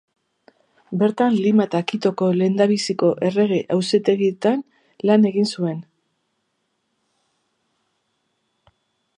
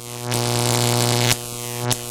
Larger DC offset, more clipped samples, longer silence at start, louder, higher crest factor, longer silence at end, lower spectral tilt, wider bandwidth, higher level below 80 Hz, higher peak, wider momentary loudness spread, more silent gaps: neither; neither; first, 0.9 s vs 0 s; about the same, -19 LUFS vs -20 LUFS; about the same, 18 dB vs 20 dB; first, 3.35 s vs 0 s; first, -6.5 dB/octave vs -3.5 dB/octave; second, 10.5 kHz vs 17.5 kHz; second, -72 dBFS vs -48 dBFS; about the same, -4 dBFS vs -2 dBFS; about the same, 8 LU vs 7 LU; neither